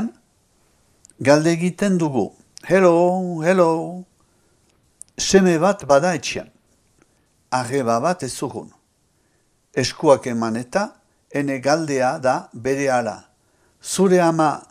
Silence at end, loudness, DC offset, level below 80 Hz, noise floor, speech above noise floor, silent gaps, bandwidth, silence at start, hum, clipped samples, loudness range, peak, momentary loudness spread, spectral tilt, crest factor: 0.1 s; -19 LUFS; under 0.1%; -56 dBFS; -63 dBFS; 45 dB; none; 14.5 kHz; 0 s; none; under 0.1%; 5 LU; 0 dBFS; 14 LU; -5 dB/octave; 20 dB